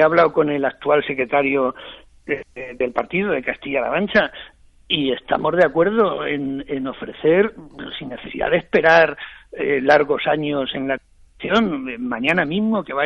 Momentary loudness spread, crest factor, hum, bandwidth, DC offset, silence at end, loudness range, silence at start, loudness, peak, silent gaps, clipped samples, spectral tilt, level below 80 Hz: 15 LU; 16 dB; none; 8.2 kHz; under 0.1%; 0 s; 4 LU; 0 s; -19 LUFS; -4 dBFS; none; under 0.1%; -6.5 dB/octave; -50 dBFS